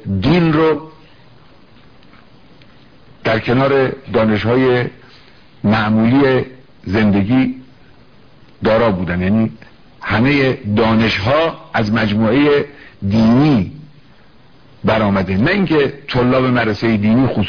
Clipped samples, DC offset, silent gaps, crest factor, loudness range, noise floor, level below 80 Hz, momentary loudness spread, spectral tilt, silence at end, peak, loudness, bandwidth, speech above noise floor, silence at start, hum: under 0.1%; 0.5%; none; 14 dB; 4 LU; -47 dBFS; -40 dBFS; 9 LU; -8 dB/octave; 0 s; -2 dBFS; -15 LUFS; 5.4 kHz; 33 dB; 0.05 s; none